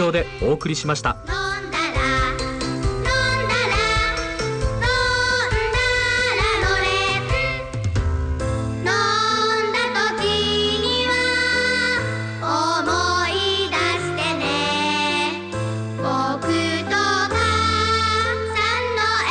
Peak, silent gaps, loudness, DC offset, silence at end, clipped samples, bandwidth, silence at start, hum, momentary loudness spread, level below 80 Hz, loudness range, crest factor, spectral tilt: -8 dBFS; none; -20 LUFS; under 0.1%; 0 s; under 0.1%; 9.6 kHz; 0 s; none; 6 LU; -32 dBFS; 2 LU; 12 dB; -4 dB/octave